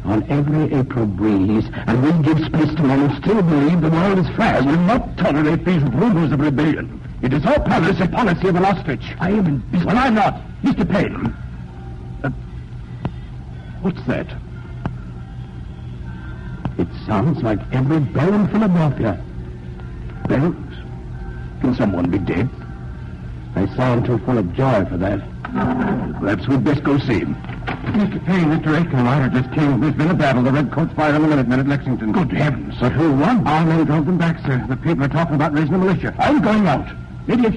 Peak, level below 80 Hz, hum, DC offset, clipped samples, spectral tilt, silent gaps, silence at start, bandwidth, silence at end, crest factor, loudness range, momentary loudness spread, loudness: -6 dBFS; -36 dBFS; none; under 0.1%; under 0.1%; -8.5 dB/octave; none; 0 s; 9 kHz; 0 s; 12 dB; 9 LU; 16 LU; -18 LUFS